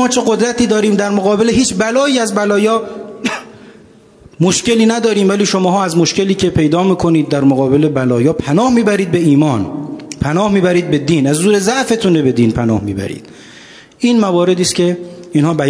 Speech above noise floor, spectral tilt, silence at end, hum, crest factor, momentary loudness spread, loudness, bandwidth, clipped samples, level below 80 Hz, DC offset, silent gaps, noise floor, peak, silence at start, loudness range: 30 dB; -5 dB/octave; 0 s; none; 12 dB; 9 LU; -13 LUFS; 11 kHz; under 0.1%; -42 dBFS; under 0.1%; none; -42 dBFS; 0 dBFS; 0 s; 3 LU